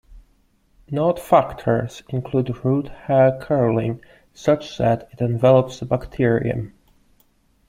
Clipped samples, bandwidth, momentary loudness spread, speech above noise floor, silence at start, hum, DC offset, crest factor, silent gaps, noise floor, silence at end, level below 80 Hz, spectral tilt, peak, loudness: under 0.1%; 15.5 kHz; 11 LU; 41 dB; 0.1 s; none; under 0.1%; 20 dB; none; -60 dBFS; 1 s; -48 dBFS; -8 dB/octave; -2 dBFS; -20 LUFS